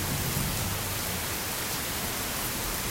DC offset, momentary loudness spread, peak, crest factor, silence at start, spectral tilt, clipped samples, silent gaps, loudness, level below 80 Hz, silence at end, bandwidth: under 0.1%; 2 LU; -14 dBFS; 16 dB; 0 s; -2.5 dB/octave; under 0.1%; none; -29 LUFS; -44 dBFS; 0 s; 16.5 kHz